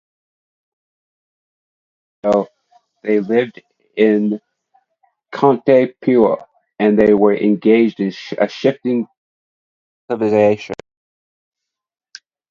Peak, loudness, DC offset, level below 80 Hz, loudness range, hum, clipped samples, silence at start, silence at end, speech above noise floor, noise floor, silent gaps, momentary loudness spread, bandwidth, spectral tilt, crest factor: 0 dBFS; -16 LUFS; under 0.1%; -58 dBFS; 8 LU; none; under 0.1%; 2.25 s; 1.75 s; 49 dB; -63 dBFS; 9.17-10.08 s; 15 LU; 7.2 kHz; -7.5 dB/octave; 18 dB